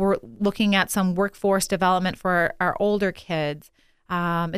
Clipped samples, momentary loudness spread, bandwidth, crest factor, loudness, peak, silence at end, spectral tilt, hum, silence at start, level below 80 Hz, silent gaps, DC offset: under 0.1%; 6 LU; 15.5 kHz; 18 dB; -23 LUFS; -6 dBFS; 0 s; -5 dB/octave; none; 0 s; -50 dBFS; none; under 0.1%